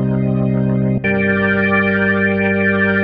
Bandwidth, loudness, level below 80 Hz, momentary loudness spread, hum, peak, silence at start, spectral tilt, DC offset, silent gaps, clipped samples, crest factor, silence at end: 5 kHz; -15 LUFS; -40 dBFS; 3 LU; 50 Hz at -45 dBFS; -2 dBFS; 0 s; -10.5 dB/octave; under 0.1%; none; under 0.1%; 12 dB; 0 s